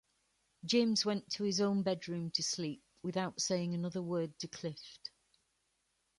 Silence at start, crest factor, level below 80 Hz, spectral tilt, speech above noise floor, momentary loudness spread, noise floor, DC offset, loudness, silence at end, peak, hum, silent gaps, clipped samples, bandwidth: 0.65 s; 20 dB; -76 dBFS; -4.5 dB/octave; 45 dB; 13 LU; -80 dBFS; under 0.1%; -36 LUFS; 1.1 s; -18 dBFS; none; none; under 0.1%; 11.5 kHz